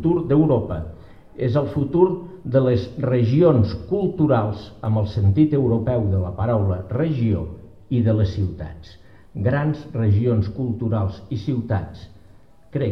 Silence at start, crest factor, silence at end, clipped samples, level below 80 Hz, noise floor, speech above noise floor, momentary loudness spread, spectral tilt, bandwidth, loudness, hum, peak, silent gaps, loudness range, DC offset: 0 s; 18 dB; 0 s; under 0.1%; -42 dBFS; -51 dBFS; 31 dB; 11 LU; -10.5 dB/octave; 6 kHz; -21 LUFS; none; -4 dBFS; none; 4 LU; 0.4%